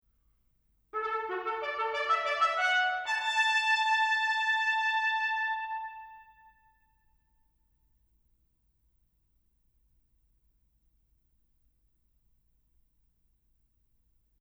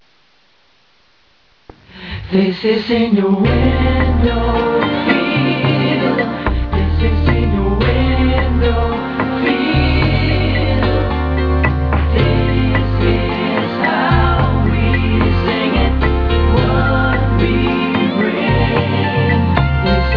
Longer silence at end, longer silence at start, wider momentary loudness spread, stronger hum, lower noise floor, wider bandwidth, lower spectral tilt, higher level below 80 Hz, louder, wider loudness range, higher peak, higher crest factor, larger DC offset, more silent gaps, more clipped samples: first, 8.2 s vs 0 s; second, 0.95 s vs 1.95 s; first, 10 LU vs 3 LU; neither; first, -72 dBFS vs -54 dBFS; first, over 20 kHz vs 5.4 kHz; second, 0.5 dB/octave vs -9 dB/octave; second, -72 dBFS vs -20 dBFS; second, -28 LUFS vs -15 LUFS; first, 10 LU vs 1 LU; second, -16 dBFS vs 0 dBFS; about the same, 18 dB vs 14 dB; second, under 0.1% vs 0.2%; neither; neither